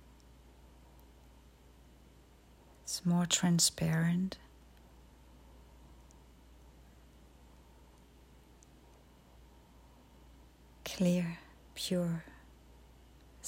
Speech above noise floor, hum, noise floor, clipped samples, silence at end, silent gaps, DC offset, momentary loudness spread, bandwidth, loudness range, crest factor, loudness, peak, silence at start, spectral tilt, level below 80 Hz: 29 dB; none; -60 dBFS; under 0.1%; 0 s; none; under 0.1%; 21 LU; 16 kHz; 10 LU; 24 dB; -33 LUFS; -14 dBFS; 2.85 s; -4 dB/octave; -60 dBFS